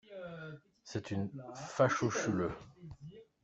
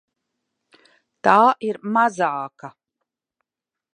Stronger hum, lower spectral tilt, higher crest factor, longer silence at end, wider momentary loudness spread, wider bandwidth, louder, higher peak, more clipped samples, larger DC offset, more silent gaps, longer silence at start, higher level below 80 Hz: neither; about the same, -5.5 dB/octave vs -5.5 dB/octave; about the same, 22 dB vs 22 dB; second, 0.2 s vs 1.25 s; first, 22 LU vs 13 LU; second, 8.2 kHz vs 10 kHz; second, -36 LUFS vs -19 LUFS; second, -14 dBFS vs 0 dBFS; neither; neither; neither; second, 0.1 s vs 1.25 s; first, -66 dBFS vs -74 dBFS